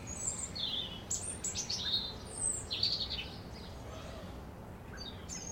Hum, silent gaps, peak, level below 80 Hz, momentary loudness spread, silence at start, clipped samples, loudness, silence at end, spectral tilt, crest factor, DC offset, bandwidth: none; none; -18 dBFS; -54 dBFS; 15 LU; 0 s; under 0.1%; -36 LUFS; 0 s; -1.5 dB/octave; 22 dB; under 0.1%; 16.5 kHz